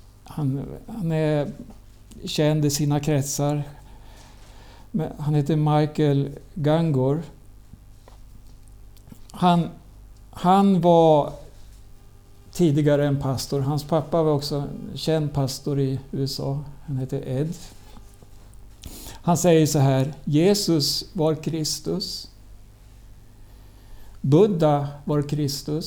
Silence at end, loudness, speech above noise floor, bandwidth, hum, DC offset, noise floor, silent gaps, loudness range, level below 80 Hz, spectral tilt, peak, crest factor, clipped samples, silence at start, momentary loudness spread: 0 s; -22 LUFS; 25 dB; 18.5 kHz; none; under 0.1%; -47 dBFS; none; 7 LU; -46 dBFS; -6 dB/octave; -6 dBFS; 18 dB; under 0.1%; 0.25 s; 14 LU